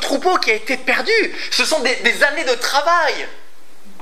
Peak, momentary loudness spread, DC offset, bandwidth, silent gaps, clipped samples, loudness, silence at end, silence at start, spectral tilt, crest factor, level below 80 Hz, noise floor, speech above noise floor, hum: 0 dBFS; 4 LU; 5%; 16 kHz; none; under 0.1%; -16 LUFS; 0.65 s; 0 s; -1 dB/octave; 18 dB; -72 dBFS; -48 dBFS; 30 dB; none